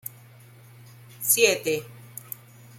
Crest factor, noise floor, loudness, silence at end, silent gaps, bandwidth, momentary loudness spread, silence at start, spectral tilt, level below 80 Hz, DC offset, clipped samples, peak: 24 dB; -50 dBFS; -22 LUFS; 0.6 s; none; 16.5 kHz; 22 LU; 0.05 s; -1.5 dB/octave; -72 dBFS; under 0.1%; under 0.1%; -4 dBFS